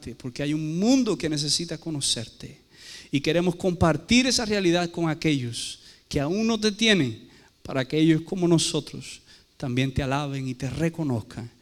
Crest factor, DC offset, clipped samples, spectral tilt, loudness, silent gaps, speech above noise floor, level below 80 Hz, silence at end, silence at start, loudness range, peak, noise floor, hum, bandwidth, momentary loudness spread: 18 dB; under 0.1%; under 0.1%; -4.5 dB/octave; -24 LUFS; none; 21 dB; -48 dBFS; 0.1 s; 0 s; 2 LU; -6 dBFS; -46 dBFS; none; 15 kHz; 17 LU